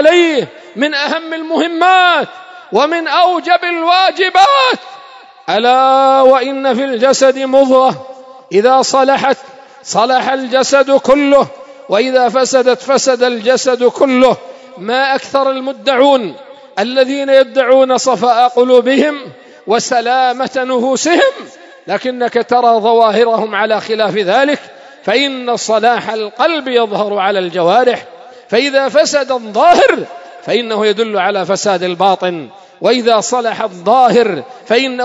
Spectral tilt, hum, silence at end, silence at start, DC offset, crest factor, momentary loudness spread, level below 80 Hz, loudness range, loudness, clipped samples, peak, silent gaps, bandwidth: -3 dB/octave; none; 0 s; 0 s; under 0.1%; 12 dB; 9 LU; -60 dBFS; 3 LU; -11 LUFS; 0.3%; 0 dBFS; none; 8 kHz